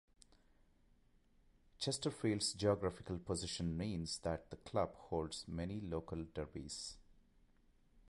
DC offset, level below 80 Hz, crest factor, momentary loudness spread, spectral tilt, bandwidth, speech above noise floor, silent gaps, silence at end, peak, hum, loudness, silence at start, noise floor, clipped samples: under 0.1%; -58 dBFS; 22 dB; 10 LU; -5 dB/octave; 11.5 kHz; 30 dB; none; 0.1 s; -22 dBFS; none; -42 LUFS; 1.8 s; -71 dBFS; under 0.1%